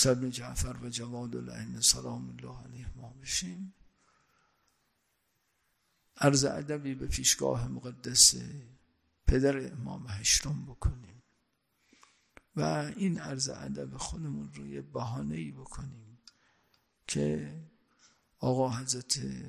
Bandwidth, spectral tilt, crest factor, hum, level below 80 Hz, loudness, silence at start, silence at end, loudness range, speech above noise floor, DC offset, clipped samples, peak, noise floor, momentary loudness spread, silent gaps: 15.5 kHz; -3 dB/octave; 26 dB; none; -46 dBFS; -30 LUFS; 0 s; 0 s; 13 LU; 45 dB; under 0.1%; under 0.1%; -8 dBFS; -77 dBFS; 19 LU; none